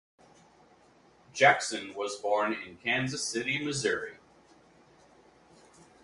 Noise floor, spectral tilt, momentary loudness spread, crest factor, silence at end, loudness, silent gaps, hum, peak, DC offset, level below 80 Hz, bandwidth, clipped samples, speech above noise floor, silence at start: -61 dBFS; -3 dB/octave; 12 LU; 26 dB; 1.9 s; -29 LUFS; none; none; -8 dBFS; under 0.1%; -70 dBFS; 11.5 kHz; under 0.1%; 32 dB; 1.35 s